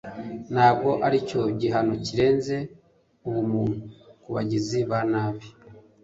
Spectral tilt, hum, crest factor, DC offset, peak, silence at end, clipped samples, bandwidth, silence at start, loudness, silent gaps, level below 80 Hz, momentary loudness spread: -6.5 dB/octave; none; 20 dB; under 0.1%; -6 dBFS; 0.25 s; under 0.1%; 7.8 kHz; 0.05 s; -25 LUFS; none; -56 dBFS; 16 LU